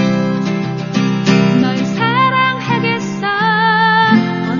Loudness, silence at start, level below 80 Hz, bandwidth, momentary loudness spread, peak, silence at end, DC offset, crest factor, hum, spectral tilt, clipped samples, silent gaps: -13 LUFS; 0 s; -56 dBFS; 7.2 kHz; 7 LU; 0 dBFS; 0 s; under 0.1%; 14 dB; none; -6 dB/octave; under 0.1%; none